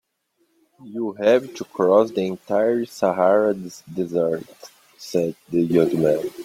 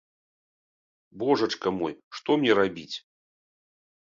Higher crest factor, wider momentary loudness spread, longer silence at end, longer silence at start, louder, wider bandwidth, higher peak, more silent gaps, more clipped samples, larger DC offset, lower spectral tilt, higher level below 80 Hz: about the same, 18 dB vs 22 dB; about the same, 13 LU vs 15 LU; second, 0 s vs 1.15 s; second, 0.85 s vs 1.15 s; first, -21 LUFS vs -26 LUFS; first, 16 kHz vs 7.6 kHz; first, -4 dBFS vs -8 dBFS; second, none vs 2.04-2.11 s; neither; neither; first, -6.5 dB/octave vs -5 dB/octave; about the same, -64 dBFS vs -66 dBFS